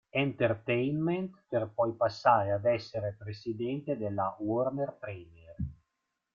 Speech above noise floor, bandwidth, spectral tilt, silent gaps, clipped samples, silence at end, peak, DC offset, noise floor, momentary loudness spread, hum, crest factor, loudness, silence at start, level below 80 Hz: 52 dB; 7.2 kHz; -8 dB/octave; none; under 0.1%; 0.6 s; -10 dBFS; under 0.1%; -83 dBFS; 14 LU; none; 20 dB; -32 LUFS; 0.15 s; -58 dBFS